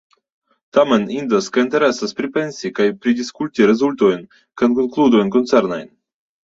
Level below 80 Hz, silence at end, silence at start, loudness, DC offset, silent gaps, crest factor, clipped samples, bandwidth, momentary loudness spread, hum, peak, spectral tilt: -60 dBFS; 0.65 s; 0.75 s; -17 LUFS; under 0.1%; none; 16 dB; under 0.1%; 7.8 kHz; 8 LU; none; -2 dBFS; -5.5 dB/octave